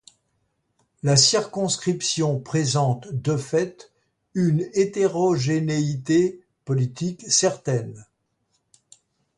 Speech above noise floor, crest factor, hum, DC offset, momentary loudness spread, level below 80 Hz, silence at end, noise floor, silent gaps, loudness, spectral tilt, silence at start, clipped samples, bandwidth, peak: 50 dB; 20 dB; none; under 0.1%; 9 LU; -62 dBFS; 1.35 s; -72 dBFS; none; -22 LUFS; -4.5 dB/octave; 1.05 s; under 0.1%; 11.5 kHz; -4 dBFS